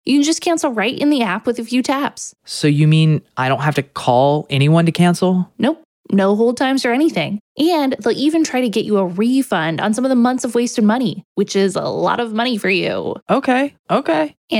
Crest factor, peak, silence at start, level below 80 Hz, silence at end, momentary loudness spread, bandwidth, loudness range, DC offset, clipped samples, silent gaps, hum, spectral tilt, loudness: 16 dB; 0 dBFS; 0.05 s; -64 dBFS; 0 s; 6 LU; 15.5 kHz; 2 LU; under 0.1%; under 0.1%; 5.85-6.04 s, 7.40-7.55 s, 11.25-11.35 s, 13.22-13.26 s, 13.79-13.84 s, 14.37-14.48 s; none; -5.5 dB/octave; -17 LUFS